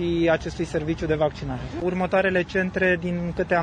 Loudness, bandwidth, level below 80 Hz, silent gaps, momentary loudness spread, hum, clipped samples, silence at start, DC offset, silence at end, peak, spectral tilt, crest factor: -24 LUFS; 9.8 kHz; -42 dBFS; none; 6 LU; none; under 0.1%; 0 s; under 0.1%; 0 s; -8 dBFS; -7 dB/octave; 16 dB